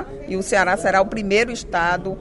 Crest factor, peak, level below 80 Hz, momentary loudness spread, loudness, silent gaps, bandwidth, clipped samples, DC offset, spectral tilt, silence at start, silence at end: 16 dB; -4 dBFS; -40 dBFS; 6 LU; -20 LUFS; none; 11.5 kHz; under 0.1%; under 0.1%; -4 dB/octave; 0 s; 0 s